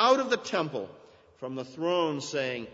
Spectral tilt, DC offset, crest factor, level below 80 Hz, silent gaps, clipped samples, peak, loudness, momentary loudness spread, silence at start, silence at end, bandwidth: -4 dB/octave; under 0.1%; 20 dB; -76 dBFS; none; under 0.1%; -10 dBFS; -30 LUFS; 13 LU; 0 s; 0.05 s; 8 kHz